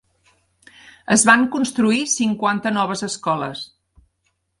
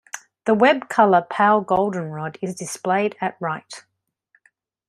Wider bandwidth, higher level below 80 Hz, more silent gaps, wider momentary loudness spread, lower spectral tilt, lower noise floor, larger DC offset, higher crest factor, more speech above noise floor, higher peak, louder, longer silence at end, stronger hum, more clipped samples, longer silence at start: second, 11.5 kHz vs 13.5 kHz; about the same, -62 dBFS vs -64 dBFS; neither; about the same, 16 LU vs 14 LU; second, -3 dB/octave vs -5 dB/octave; first, -70 dBFS vs -65 dBFS; neither; about the same, 20 dB vs 20 dB; first, 52 dB vs 45 dB; about the same, 0 dBFS vs -2 dBFS; about the same, -18 LUFS vs -20 LUFS; second, 0.95 s vs 1.1 s; neither; neither; first, 0.85 s vs 0.15 s